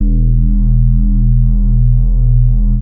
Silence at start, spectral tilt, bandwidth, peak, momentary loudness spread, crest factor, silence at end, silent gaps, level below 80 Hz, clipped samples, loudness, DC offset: 0 s; -16 dB/octave; 0.8 kHz; -2 dBFS; 1 LU; 8 dB; 0 s; none; -10 dBFS; under 0.1%; -13 LUFS; under 0.1%